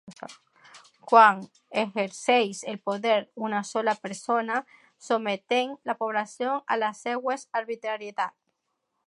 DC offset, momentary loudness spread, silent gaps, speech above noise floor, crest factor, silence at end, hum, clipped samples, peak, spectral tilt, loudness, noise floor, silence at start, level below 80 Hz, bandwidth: under 0.1%; 12 LU; none; 53 dB; 24 dB; 0.8 s; none; under 0.1%; -4 dBFS; -3.5 dB/octave; -26 LUFS; -79 dBFS; 0.05 s; -84 dBFS; 11.5 kHz